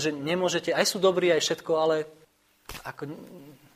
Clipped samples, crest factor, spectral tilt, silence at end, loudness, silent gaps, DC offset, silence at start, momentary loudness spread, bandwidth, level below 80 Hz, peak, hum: under 0.1%; 20 dB; -3.5 dB/octave; 0.2 s; -25 LUFS; none; under 0.1%; 0 s; 17 LU; 15.5 kHz; -62 dBFS; -8 dBFS; none